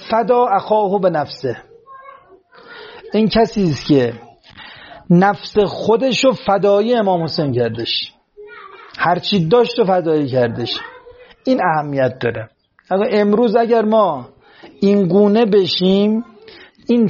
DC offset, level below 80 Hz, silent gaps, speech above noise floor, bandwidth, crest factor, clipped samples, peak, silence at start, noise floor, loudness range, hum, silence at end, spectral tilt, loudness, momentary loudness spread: under 0.1%; -50 dBFS; none; 31 dB; 7.2 kHz; 16 dB; under 0.1%; 0 dBFS; 0 s; -45 dBFS; 4 LU; none; 0 s; -5 dB/octave; -16 LUFS; 19 LU